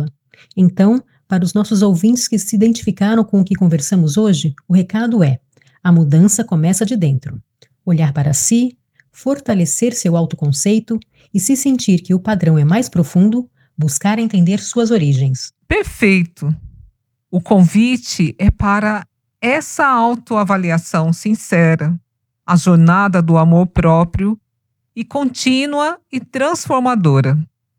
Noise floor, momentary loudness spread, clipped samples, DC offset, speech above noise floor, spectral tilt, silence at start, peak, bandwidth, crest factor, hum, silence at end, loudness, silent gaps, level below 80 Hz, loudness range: -71 dBFS; 10 LU; under 0.1%; under 0.1%; 57 dB; -6 dB/octave; 0 s; 0 dBFS; 15.5 kHz; 14 dB; none; 0.35 s; -14 LUFS; none; -38 dBFS; 3 LU